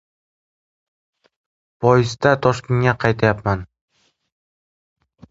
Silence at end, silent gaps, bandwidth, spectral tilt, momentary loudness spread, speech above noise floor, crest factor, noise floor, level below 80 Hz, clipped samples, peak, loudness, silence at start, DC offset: 1.65 s; none; 7.8 kHz; -6.5 dB/octave; 7 LU; over 73 dB; 22 dB; under -90 dBFS; -46 dBFS; under 0.1%; 0 dBFS; -18 LUFS; 1.8 s; under 0.1%